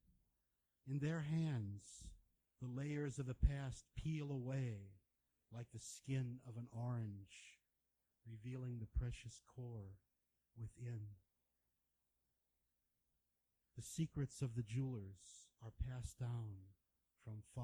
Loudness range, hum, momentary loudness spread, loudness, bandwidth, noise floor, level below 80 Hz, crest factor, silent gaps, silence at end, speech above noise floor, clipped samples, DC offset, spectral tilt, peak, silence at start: 11 LU; none; 18 LU; -47 LUFS; over 20 kHz; -88 dBFS; -56 dBFS; 26 dB; none; 0 s; 42 dB; under 0.1%; under 0.1%; -6.5 dB/octave; -22 dBFS; 0.85 s